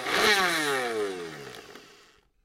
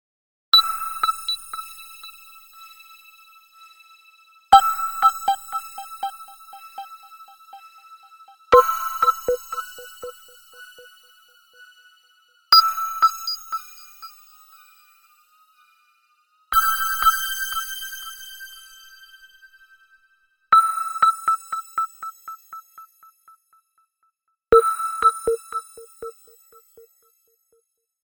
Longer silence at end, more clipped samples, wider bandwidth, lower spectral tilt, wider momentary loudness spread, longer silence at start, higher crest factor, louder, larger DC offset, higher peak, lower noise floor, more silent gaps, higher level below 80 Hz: second, 0.6 s vs 1.9 s; neither; second, 16 kHz vs over 20 kHz; first, -1.5 dB/octave vs 0 dB/octave; second, 21 LU vs 26 LU; second, 0 s vs 0.55 s; second, 18 dB vs 24 dB; second, -25 LUFS vs -19 LUFS; neither; second, -10 dBFS vs 0 dBFS; second, -59 dBFS vs -70 dBFS; neither; second, -64 dBFS vs -54 dBFS